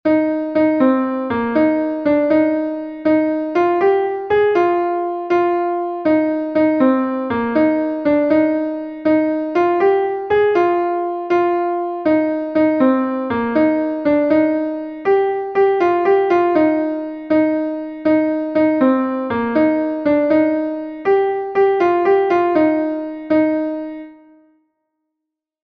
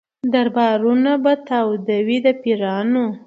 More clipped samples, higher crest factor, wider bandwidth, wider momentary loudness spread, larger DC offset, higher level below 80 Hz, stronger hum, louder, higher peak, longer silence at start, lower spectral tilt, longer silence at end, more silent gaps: neither; about the same, 14 dB vs 14 dB; about the same, 5.2 kHz vs 5.6 kHz; first, 7 LU vs 4 LU; neither; first, -56 dBFS vs -70 dBFS; neither; about the same, -17 LUFS vs -18 LUFS; about the same, -2 dBFS vs -4 dBFS; second, 0.05 s vs 0.25 s; about the same, -8 dB/octave vs -7.5 dB/octave; first, 1.5 s vs 0.1 s; neither